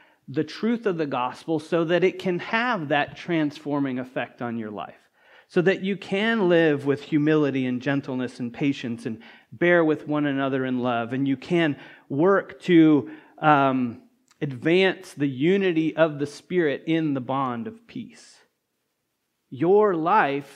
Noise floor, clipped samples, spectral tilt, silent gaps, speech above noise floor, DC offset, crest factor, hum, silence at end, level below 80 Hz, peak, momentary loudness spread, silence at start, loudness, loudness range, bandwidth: -76 dBFS; under 0.1%; -7 dB/octave; none; 53 dB; under 0.1%; 22 dB; none; 0.05 s; -74 dBFS; -2 dBFS; 13 LU; 0.3 s; -23 LUFS; 5 LU; 11 kHz